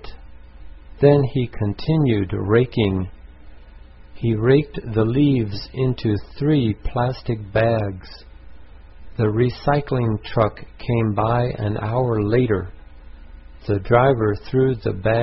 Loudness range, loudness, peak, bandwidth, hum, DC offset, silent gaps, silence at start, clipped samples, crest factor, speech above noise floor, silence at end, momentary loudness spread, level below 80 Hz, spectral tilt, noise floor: 3 LU; -20 LUFS; -2 dBFS; 5.8 kHz; none; 0.6%; none; 0 s; under 0.1%; 18 dB; 23 dB; 0 s; 9 LU; -38 dBFS; -11.5 dB/octave; -42 dBFS